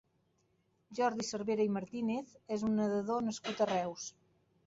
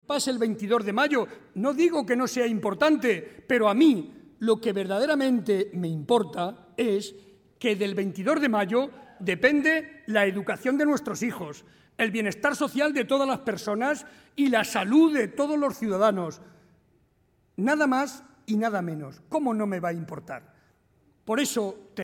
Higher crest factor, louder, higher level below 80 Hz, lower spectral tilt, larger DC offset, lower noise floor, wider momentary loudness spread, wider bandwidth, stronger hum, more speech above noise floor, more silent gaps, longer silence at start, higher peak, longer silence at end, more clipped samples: about the same, 18 dB vs 20 dB; second, -35 LUFS vs -26 LUFS; second, -74 dBFS vs -68 dBFS; about the same, -5 dB/octave vs -5 dB/octave; neither; first, -76 dBFS vs -66 dBFS; second, 8 LU vs 11 LU; second, 8 kHz vs 17 kHz; neither; about the same, 41 dB vs 41 dB; neither; first, 0.9 s vs 0.1 s; second, -20 dBFS vs -6 dBFS; first, 0.55 s vs 0 s; neither